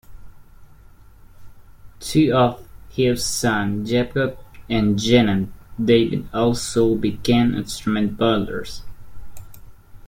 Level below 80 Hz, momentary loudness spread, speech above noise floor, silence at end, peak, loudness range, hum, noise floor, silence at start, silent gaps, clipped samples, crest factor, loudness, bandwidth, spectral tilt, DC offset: -42 dBFS; 12 LU; 27 dB; 0.1 s; -2 dBFS; 3 LU; none; -46 dBFS; 0.1 s; none; under 0.1%; 18 dB; -20 LUFS; 16.5 kHz; -5.5 dB/octave; under 0.1%